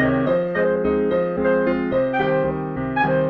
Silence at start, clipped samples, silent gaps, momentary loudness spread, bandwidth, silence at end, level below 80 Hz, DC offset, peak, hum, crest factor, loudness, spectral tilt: 0 s; under 0.1%; none; 3 LU; 5.2 kHz; 0 s; -44 dBFS; under 0.1%; -8 dBFS; none; 12 dB; -20 LUFS; -9.5 dB/octave